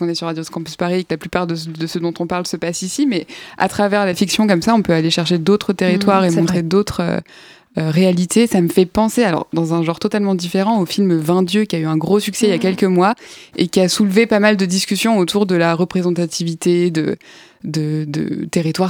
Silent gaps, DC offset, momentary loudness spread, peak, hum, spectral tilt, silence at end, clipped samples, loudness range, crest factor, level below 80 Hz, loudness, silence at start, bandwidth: none; under 0.1%; 8 LU; 0 dBFS; none; -5.5 dB/octave; 0 s; under 0.1%; 4 LU; 16 dB; -50 dBFS; -16 LUFS; 0 s; 18 kHz